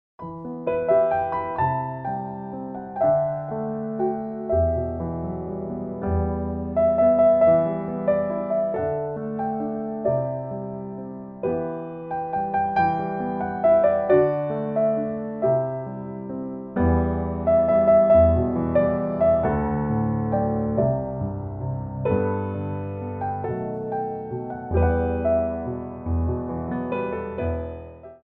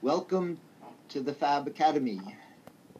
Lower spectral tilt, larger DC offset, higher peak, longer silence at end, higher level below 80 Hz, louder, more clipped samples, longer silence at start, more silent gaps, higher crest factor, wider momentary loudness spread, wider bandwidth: first, -12 dB/octave vs -6 dB/octave; neither; first, -6 dBFS vs -14 dBFS; about the same, 0.05 s vs 0 s; first, -40 dBFS vs -86 dBFS; first, -24 LUFS vs -31 LUFS; neither; first, 0.2 s vs 0 s; neither; about the same, 16 dB vs 18 dB; second, 13 LU vs 16 LU; second, 4.3 kHz vs 14 kHz